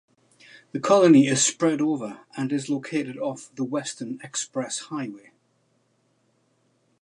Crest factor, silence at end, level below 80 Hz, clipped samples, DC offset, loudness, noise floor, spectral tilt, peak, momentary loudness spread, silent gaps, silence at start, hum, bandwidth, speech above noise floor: 20 dB; 1.85 s; -78 dBFS; under 0.1%; under 0.1%; -23 LUFS; -68 dBFS; -4.5 dB/octave; -6 dBFS; 17 LU; none; 0.75 s; none; 11.5 kHz; 44 dB